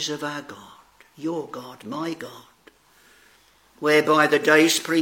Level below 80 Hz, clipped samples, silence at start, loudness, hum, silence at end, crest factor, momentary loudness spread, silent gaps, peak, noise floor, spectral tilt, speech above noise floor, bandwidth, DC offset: -72 dBFS; under 0.1%; 0 s; -21 LUFS; none; 0 s; 22 dB; 20 LU; none; -2 dBFS; -57 dBFS; -3 dB/octave; 35 dB; 17 kHz; under 0.1%